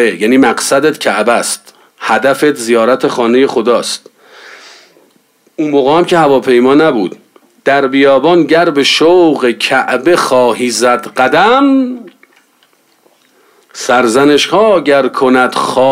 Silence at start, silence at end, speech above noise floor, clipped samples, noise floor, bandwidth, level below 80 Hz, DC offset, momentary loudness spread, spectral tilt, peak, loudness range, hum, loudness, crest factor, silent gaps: 0 s; 0 s; 43 dB; under 0.1%; -52 dBFS; 16 kHz; -54 dBFS; under 0.1%; 8 LU; -4 dB/octave; 0 dBFS; 4 LU; none; -9 LUFS; 10 dB; none